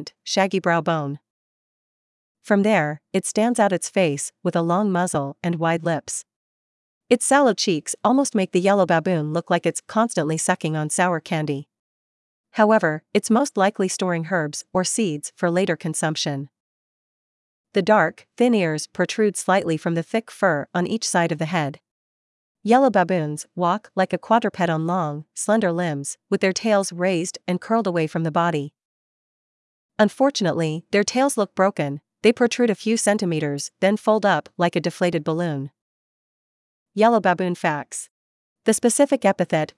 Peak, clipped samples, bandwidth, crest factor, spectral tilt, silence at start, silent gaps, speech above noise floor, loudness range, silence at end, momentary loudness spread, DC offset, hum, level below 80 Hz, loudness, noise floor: -2 dBFS; under 0.1%; 12 kHz; 20 dB; -4.5 dB/octave; 0 s; 1.30-2.35 s, 6.36-7.01 s, 11.79-12.44 s, 16.60-17.64 s, 21.91-22.55 s, 28.85-29.89 s, 35.81-36.86 s, 38.10-38.56 s; over 69 dB; 3 LU; 0.1 s; 8 LU; under 0.1%; none; -72 dBFS; -21 LUFS; under -90 dBFS